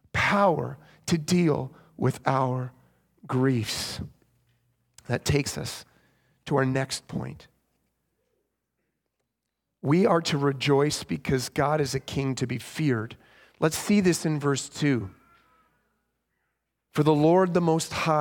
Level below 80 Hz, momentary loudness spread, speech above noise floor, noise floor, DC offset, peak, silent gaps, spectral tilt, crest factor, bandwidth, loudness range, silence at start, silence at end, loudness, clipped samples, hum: -56 dBFS; 14 LU; 58 dB; -83 dBFS; under 0.1%; -6 dBFS; none; -5.5 dB/octave; 22 dB; 18.5 kHz; 7 LU; 0.15 s; 0 s; -26 LUFS; under 0.1%; none